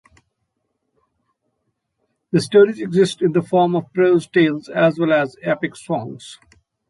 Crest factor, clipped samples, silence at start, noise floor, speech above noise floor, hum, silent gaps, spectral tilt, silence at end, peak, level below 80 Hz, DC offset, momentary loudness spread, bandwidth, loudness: 16 dB; under 0.1%; 2.35 s; -73 dBFS; 56 dB; none; none; -6.5 dB/octave; 0.55 s; -2 dBFS; -64 dBFS; under 0.1%; 11 LU; 11.5 kHz; -18 LUFS